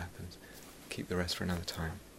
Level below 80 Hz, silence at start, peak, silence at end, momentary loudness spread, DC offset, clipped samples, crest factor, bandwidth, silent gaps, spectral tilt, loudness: -54 dBFS; 0 s; -18 dBFS; 0 s; 16 LU; under 0.1%; under 0.1%; 22 dB; 16 kHz; none; -4.5 dB/octave; -38 LUFS